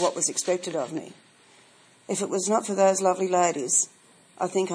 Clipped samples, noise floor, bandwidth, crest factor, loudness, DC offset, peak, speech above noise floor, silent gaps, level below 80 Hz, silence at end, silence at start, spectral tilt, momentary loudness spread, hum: under 0.1%; -56 dBFS; 10.5 kHz; 18 dB; -25 LUFS; under 0.1%; -8 dBFS; 31 dB; none; -82 dBFS; 0 s; 0 s; -3 dB/octave; 10 LU; none